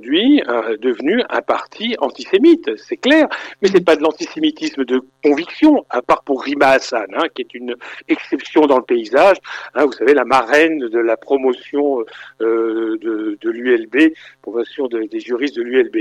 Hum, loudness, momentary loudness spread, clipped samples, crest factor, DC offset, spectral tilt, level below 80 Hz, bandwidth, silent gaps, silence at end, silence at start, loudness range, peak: none; -16 LUFS; 10 LU; under 0.1%; 14 dB; under 0.1%; -4.5 dB/octave; -60 dBFS; 10 kHz; none; 0 s; 0 s; 4 LU; -2 dBFS